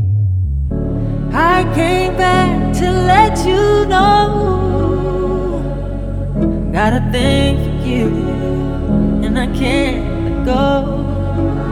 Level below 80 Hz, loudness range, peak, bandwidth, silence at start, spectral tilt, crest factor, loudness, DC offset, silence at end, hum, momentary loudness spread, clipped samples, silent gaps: -22 dBFS; 4 LU; 0 dBFS; 14.5 kHz; 0 s; -6.5 dB/octave; 14 dB; -15 LUFS; under 0.1%; 0 s; none; 8 LU; under 0.1%; none